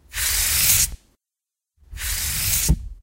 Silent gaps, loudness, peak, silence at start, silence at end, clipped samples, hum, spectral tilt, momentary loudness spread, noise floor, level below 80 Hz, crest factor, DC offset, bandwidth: none; -19 LUFS; -4 dBFS; 0.1 s; 0.05 s; under 0.1%; none; -1 dB/octave; 10 LU; -87 dBFS; -32 dBFS; 20 dB; under 0.1%; 16 kHz